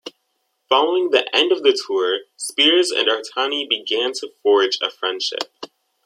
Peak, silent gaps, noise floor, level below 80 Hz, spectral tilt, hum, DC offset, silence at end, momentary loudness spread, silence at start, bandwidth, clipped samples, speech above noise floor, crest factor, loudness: -2 dBFS; none; -71 dBFS; -78 dBFS; -0.5 dB/octave; none; under 0.1%; 0.4 s; 10 LU; 0.05 s; 14 kHz; under 0.1%; 52 dB; 18 dB; -18 LUFS